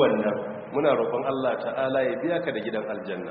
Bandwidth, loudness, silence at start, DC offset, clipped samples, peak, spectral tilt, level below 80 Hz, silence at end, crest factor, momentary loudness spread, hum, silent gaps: 4.6 kHz; -26 LUFS; 0 s; under 0.1%; under 0.1%; -8 dBFS; -4 dB/octave; -68 dBFS; 0 s; 18 dB; 8 LU; none; none